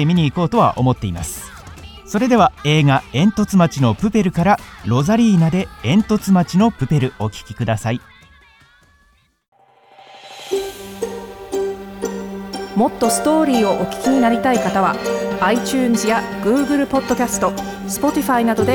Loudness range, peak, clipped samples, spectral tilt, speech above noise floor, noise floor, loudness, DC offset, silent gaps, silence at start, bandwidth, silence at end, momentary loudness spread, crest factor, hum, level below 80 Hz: 12 LU; -2 dBFS; under 0.1%; -6 dB/octave; 41 dB; -57 dBFS; -17 LUFS; under 0.1%; 9.48-9.52 s; 0 s; 19.5 kHz; 0 s; 13 LU; 16 dB; none; -44 dBFS